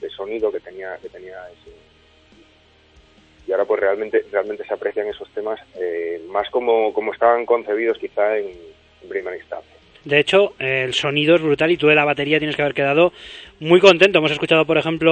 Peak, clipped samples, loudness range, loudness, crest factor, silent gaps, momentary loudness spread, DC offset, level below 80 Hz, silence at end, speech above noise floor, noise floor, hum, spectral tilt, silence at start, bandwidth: 0 dBFS; under 0.1%; 10 LU; -18 LUFS; 20 dB; none; 18 LU; under 0.1%; -56 dBFS; 0 s; 35 dB; -53 dBFS; none; -5.5 dB/octave; 0 s; 9 kHz